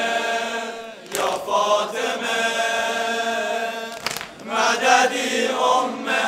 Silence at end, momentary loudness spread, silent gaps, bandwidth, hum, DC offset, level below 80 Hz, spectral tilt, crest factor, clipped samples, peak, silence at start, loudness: 0 s; 11 LU; none; 16 kHz; none; under 0.1%; -66 dBFS; -1 dB/octave; 20 dB; under 0.1%; -2 dBFS; 0 s; -21 LUFS